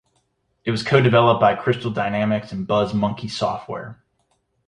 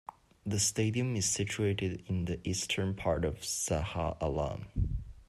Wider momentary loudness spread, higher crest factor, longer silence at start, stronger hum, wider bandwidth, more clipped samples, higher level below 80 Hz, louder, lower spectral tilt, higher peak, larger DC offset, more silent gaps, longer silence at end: first, 15 LU vs 6 LU; about the same, 18 dB vs 16 dB; first, 0.65 s vs 0.45 s; neither; second, 10.5 kHz vs 13.5 kHz; neither; second, -54 dBFS vs -46 dBFS; first, -20 LUFS vs -33 LUFS; first, -6.5 dB/octave vs -4 dB/octave; first, -2 dBFS vs -16 dBFS; neither; neither; first, 0.75 s vs 0.05 s